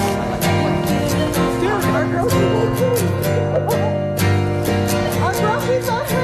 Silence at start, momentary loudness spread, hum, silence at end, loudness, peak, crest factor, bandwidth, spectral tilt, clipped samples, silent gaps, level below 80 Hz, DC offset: 0 s; 2 LU; none; 0 s; -18 LUFS; -6 dBFS; 10 dB; 14.5 kHz; -6 dB/octave; under 0.1%; none; -34 dBFS; under 0.1%